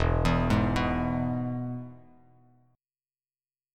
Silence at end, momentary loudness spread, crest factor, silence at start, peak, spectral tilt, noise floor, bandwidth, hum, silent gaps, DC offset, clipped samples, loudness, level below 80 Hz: 1.75 s; 12 LU; 18 dB; 0 s; -12 dBFS; -7.5 dB/octave; under -90 dBFS; 13 kHz; none; none; under 0.1%; under 0.1%; -28 LUFS; -38 dBFS